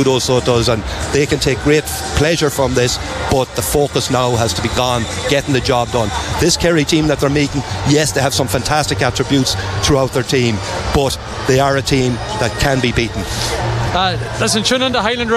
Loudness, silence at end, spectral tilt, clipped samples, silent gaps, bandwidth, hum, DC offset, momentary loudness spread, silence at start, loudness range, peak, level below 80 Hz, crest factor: -15 LUFS; 0 s; -4.5 dB/octave; under 0.1%; none; 15 kHz; none; under 0.1%; 5 LU; 0 s; 1 LU; -2 dBFS; -30 dBFS; 14 dB